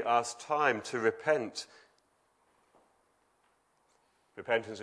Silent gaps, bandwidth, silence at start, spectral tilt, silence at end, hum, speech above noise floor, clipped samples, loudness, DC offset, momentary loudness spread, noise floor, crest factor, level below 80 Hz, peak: none; 11 kHz; 0 s; -3.5 dB/octave; 0 s; none; 41 dB; under 0.1%; -32 LUFS; under 0.1%; 14 LU; -72 dBFS; 22 dB; -84 dBFS; -12 dBFS